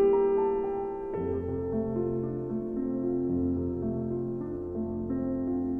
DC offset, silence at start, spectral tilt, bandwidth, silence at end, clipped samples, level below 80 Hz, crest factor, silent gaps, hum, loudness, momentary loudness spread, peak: under 0.1%; 0 s; -12 dB/octave; 3 kHz; 0 s; under 0.1%; -50 dBFS; 14 dB; none; none; -31 LUFS; 7 LU; -16 dBFS